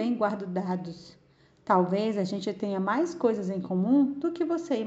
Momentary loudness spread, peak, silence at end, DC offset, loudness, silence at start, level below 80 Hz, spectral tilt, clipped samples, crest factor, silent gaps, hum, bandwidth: 9 LU; -10 dBFS; 0 s; under 0.1%; -28 LUFS; 0 s; -70 dBFS; -7.5 dB/octave; under 0.1%; 18 dB; none; none; 8 kHz